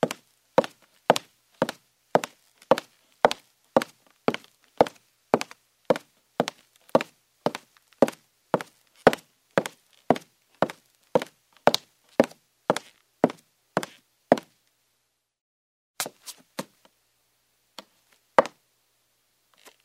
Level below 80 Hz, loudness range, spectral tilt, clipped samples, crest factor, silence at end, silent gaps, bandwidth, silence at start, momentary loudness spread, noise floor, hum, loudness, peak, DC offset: -68 dBFS; 6 LU; -4.5 dB/octave; under 0.1%; 28 dB; 1.35 s; 15.41-15.94 s; 16 kHz; 0.05 s; 15 LU; -75 dBFS; none; -27 LUFS; -2 dBFS; under 0.1%